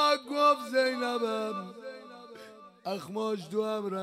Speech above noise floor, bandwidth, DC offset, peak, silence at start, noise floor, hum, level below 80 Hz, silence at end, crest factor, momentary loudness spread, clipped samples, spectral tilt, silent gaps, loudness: 18 dB; 15.5 kHz; under 0.1%; -14 dBFS; 0 s; -50 dBFS; none; -84 dBFS; 0 s; 18 dB; 22 LU; under 0.1%; -4 dB/octave; none; -30 LUFS